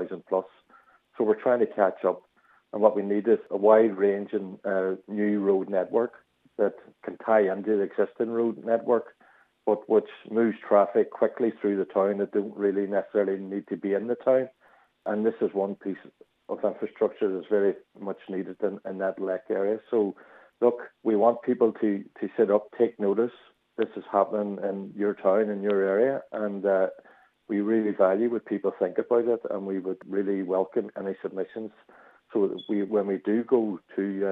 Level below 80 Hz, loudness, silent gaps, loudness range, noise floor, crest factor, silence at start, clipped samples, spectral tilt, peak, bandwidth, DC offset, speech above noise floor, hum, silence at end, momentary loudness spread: -84 dBFS; -27 LUFS; none; 5 LU; -61 dBFS; 22 dB; 0 s; under 0.1%; -9.5 dB/octave; -6 dBFS; 4 kHz; under 0.1%; 35 dB; none; 0 s; 10 LU